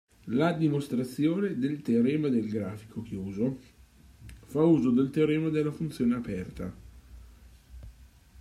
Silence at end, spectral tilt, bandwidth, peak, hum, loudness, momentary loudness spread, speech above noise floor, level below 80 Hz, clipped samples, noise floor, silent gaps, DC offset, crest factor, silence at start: 0.35 s; -8 dB/octave; 14.5 kHz; -12 dBFS; none; -28 LUFS; 13 LU; 27 dB; -54 dBFS; under 0.1%; -54 dBFS; none; under 0.1%; 16 dB; 0.25 s